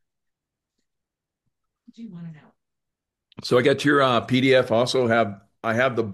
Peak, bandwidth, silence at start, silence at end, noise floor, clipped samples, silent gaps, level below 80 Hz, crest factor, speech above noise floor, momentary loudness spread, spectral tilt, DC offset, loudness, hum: -6 dBFS; 12.5 kHz; 2 s; 0 s; -85 dBFS; under 0.1%; none; -66 dBFS; 18 dB; 64 dB; 21 LU; -5.5 dB/octave; under 0.1%; -20 LUFS; none